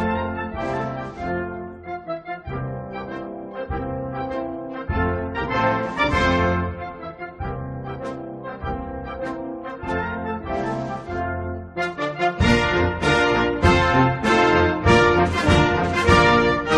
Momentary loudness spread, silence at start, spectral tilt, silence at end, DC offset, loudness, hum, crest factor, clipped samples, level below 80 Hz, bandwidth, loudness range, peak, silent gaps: 15 LU; 0 s; -6 dB/octave; 0 s; under 0.1%; -21 LUFS; none; 20 dB; under 0.1%; -36 dBFS; 11.5 kHz; 12 LU; -2 dBFS; none